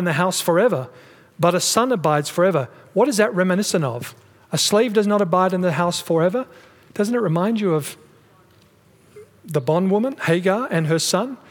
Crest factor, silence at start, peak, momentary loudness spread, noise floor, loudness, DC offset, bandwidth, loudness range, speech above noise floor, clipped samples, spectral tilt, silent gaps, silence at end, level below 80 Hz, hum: 18 dB; 0 s; -2 dBFS; 9 LU; -54 dBFS; -19 LUFS; under 0.1%; 19.5 kHz; 4 LU; 34 dB; under 0.1%; -4.5 dB/octave; none; 0.15 s; -68 dBFS; none